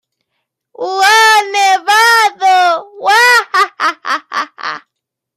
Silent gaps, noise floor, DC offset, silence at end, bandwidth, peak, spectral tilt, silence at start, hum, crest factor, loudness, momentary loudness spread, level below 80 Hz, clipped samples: none; -77 dBFS; under 0.1%; 0.6 s; 16 kHz; 0 dBFS; 1.5 dB/octave; 0.8 s; none; 12 dB; -10 LUFS; 14 LU; -72 dBFS; under 0.1%